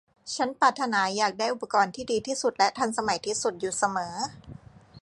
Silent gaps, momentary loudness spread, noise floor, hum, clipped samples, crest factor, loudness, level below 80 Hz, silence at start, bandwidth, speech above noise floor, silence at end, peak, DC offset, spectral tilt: none; 8 LU; -48 dBFS; none; under 0.1%; 20 dB; -27 LUFS; -62 dBFS; 0.25 s; 11.5 kHz; 21 dB; 0.05 s; -6 dBFS; under 0.1%; -2.5 dB/octave